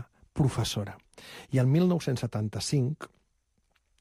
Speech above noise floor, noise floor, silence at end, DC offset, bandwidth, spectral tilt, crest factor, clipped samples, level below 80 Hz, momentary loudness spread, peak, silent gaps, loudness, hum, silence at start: 45 dB; -73 dBFS; 0.95 s; under 0.1%; 15 kHz; -6 dB/octave; 16 dB; under 0.1%; -56 dBFS; 22 LU; -14 dBFS; none; -28 LUFS; none; 0 s